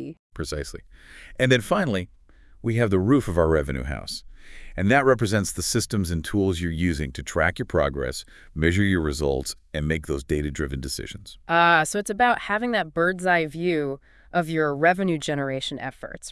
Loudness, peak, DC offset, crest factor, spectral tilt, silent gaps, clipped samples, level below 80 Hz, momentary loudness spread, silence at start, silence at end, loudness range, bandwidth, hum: -24 LUFS; -4 dBFS; under 0.1%; 20 dB; -5 dB/octave; 0.19-0.30 s; under 0.1%; -40 dBFS; 14 LU; 0 s; 0 s; 3 LU; 12 kHz; none